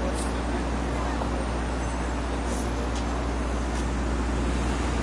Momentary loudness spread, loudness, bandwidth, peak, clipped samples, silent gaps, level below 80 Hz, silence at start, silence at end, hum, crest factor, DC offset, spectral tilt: 2 LU; -29 LUFS; 11.5 kHz; -14 dBFS; under 0.1%; none; -30 dBFS; 0 s; 0 s; 60 Hz at -30 dBFS; 12 dB; under 0.1%; -5.5 dB/octave